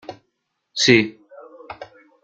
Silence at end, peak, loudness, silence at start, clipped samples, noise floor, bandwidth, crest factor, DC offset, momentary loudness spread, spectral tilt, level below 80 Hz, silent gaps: 0.4 s; 0 dBFS; -17 LUFS; 0.1 s; under 0.1%; -74 dBFS; 9.4 kHz; 22 dB; under 0.1%; 24 LU; -3.5 dB/octave; -60 dBFS; none